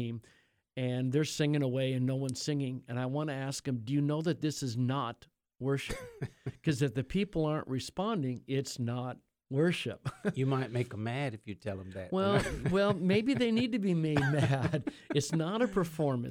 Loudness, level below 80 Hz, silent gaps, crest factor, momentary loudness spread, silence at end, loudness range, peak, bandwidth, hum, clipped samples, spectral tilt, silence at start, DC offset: -33 LUFS; -56 dBFS; none; 18 dB; 11 LU; 0 s; 5 LU; -14 dBFS; 16 kHz; none; under 0.1%; -6 dB/octave; 0 s; under 0.1%